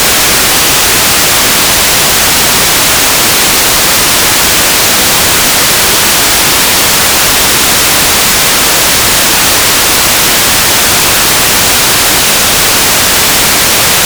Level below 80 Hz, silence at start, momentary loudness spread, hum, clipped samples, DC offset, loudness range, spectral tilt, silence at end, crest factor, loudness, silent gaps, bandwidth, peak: -28 dBFS; 0 s; 0 LU; none; 9%; under 0.1%; 0 LU; -0.5 dB/octave; 0 s; 6 dB; -4 LUFS; none; over 20 kHz; 0 dBFS